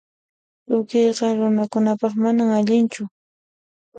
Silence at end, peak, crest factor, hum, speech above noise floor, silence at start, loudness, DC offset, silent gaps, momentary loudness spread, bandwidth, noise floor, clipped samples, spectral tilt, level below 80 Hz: 0 s; -6 dBFS; 14 dB; none; over 71 dB; 0.7 s; -19 LUFS; under 0.1%; 3.11-3.92 s; 6 LU; 9 kHz; under -90 dBFS; under 0.1%; -6.5 dB/octave; -70 dBFS